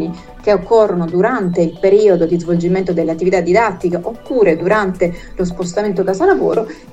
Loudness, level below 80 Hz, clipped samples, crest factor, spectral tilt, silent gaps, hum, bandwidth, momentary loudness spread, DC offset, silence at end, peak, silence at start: -15 LUFS; -40 dBFS; under 0.1%; 14 dB; -7 dB/octave; none; none; 8.8 kHz; 8 LU; under 0.1%; 0 s; 0 dBFS; 0 s